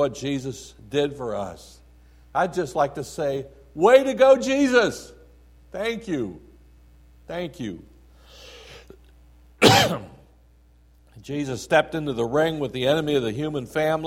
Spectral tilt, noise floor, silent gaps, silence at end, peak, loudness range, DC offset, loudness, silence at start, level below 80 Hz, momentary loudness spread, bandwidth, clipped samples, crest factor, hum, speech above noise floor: -4.5 dB/octave; -55 dBFS; none; 0 s; -2 dBFS; 13 LU; under 0.1%; -22 LUFS; 0 s; -52 dBFS; 19 LU; 16.5 kHz; under 0.1%; 22 dB; none; 32 dB